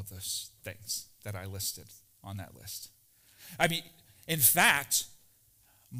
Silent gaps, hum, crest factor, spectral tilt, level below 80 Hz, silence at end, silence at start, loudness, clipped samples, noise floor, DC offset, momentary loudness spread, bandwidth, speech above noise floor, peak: none; none; 24 dB; -1.5 dB/octave; -64 dBFS; 0 s; 0 s; -28 LUFS; under 0.1%; -65 dBFS; under 0.1%; 22 LU; 16 kHz; 33 dB; -8 dBFS